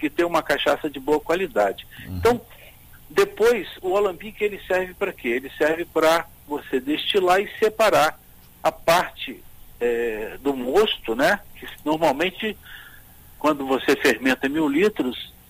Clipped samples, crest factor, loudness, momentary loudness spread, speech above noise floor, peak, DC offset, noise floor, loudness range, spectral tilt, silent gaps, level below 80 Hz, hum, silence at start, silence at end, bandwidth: under 0.1%; 16 dB; -22 LUFS; 10 LU; 24 dB; -6 dBFS; under 0.1%; -46 dBFS; 2 LU; -4 dB/octave; none; -48 dBFS; none; 0 s; 0.2 s; 15.5 kHz